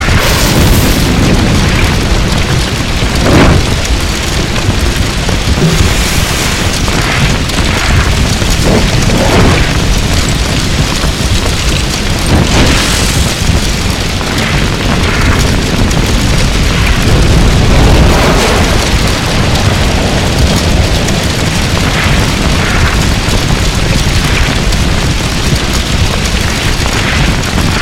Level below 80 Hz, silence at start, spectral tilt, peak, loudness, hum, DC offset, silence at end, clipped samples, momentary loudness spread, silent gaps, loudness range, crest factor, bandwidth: -14 dBFS; 0 s; -4.5 dB/octave; 0 dBFS; -10 LUFS; none; under 0.1%; 0 s; 0.5%; 4 LU; none; 2 LU; 8 dB; 17 kHz